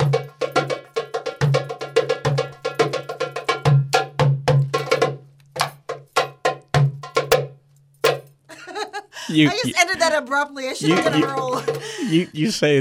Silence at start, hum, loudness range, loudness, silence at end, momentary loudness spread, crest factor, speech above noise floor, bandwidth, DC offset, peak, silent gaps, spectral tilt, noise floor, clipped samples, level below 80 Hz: 0 s; none; 3 LU; -21 LUFS; 0 s; 11 LU; 18 dB; 34 dB; 16 kHz; under 0.1%; -2 dBFS; none; -5 dB/octave; -53 dBFS; under 0.1%; -54 dBFS